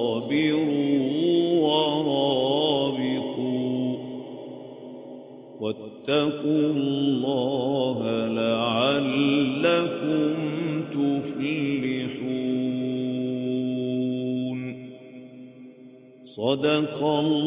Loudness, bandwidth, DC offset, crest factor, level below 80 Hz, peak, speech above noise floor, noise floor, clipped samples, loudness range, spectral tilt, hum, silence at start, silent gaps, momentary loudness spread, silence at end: -25 LUFS; 4 kHz; under 0.1%; 18 dB; -66 dBFS; -8 dBFS; 25 dB; -48 dBFS; under 0.1%; 6 LU; -10.5 dB/octave; none; 0 s; none; 18 LU; 0 s